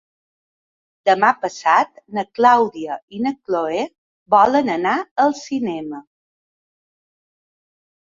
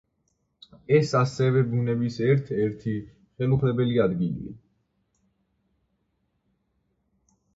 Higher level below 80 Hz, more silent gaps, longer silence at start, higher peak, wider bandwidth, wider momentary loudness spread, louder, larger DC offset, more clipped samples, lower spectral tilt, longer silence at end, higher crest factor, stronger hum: second, -64 dBFS vs -58 dBFS; first, 3.02-3.08 s, 3.98-4.26 s, 5.11-5.16 s vs none; first, 1.05 s vs 0.9 s; first, -2 dBFS vs -8 dBFS; about the same, 7.6 kHz vs 7.8 kHz; first, 14 LU vs 10 LU; first, -18 LUFS vs -24 LUFS; neither; neither; second, -4.5 dB/octave vs -8 dB/octave; second, 2.1 s vs 3 s; about the same, 18 dB vs 20 dB; neither